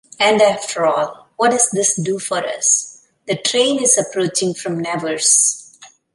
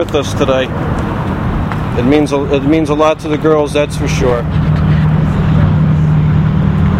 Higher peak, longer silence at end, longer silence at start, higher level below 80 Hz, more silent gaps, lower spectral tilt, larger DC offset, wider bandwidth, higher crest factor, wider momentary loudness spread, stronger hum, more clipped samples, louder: about the same, 0 dBFS vs 0 dBFS; first, 0.3 s vs 0 s; first, 0.2 s vs 0 s; second, -66 dBFS vs -24 dBFS; neither; second, -2 dB/octave vs -7.5 dB/octave; neither; about the same, 11.5 kHz vs 11 kHz; first, 18 dB vs 12 dB; first, 10 LU vs 6 LU; neither; neither; second, -16 LUFS vs -12 LUFS